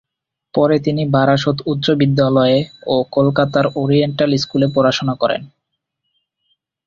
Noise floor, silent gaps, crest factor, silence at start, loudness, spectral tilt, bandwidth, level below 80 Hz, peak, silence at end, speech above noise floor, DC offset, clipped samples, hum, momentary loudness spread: -77 dBFS; none; 14 dB; 0.55 s; -16 LUFS; -7 dB/octave; 7.4 kHz; -52 dBFS; -2 dBFS; 1.4 s; 62 dB; under 0.1%; under 0.1%; none; 5 LU